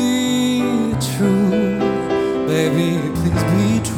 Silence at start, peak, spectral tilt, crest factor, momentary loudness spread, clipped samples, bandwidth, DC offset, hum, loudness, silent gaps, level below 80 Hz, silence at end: 0 s; -2 dBFS; -6 dB/octave; 14 dB; 3 LU; under 0.1%; 19 kHz; under 0.1%; none; -18 LUFS; none; -42 dBFS; 0 s